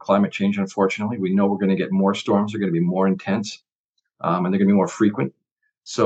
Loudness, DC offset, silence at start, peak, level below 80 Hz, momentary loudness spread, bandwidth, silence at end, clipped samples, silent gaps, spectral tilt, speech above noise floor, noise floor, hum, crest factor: -21 LUFS; under 0.1%; 0.05 s; -4 dBFS; -78 dBFS; 9 LU; 8 kHz; 0 s; under 0.1%; 3.75-3.93 s, 5.52-5.56 s; -7 dB/octave; 57 dB; -77 dBFS; none; 18 dB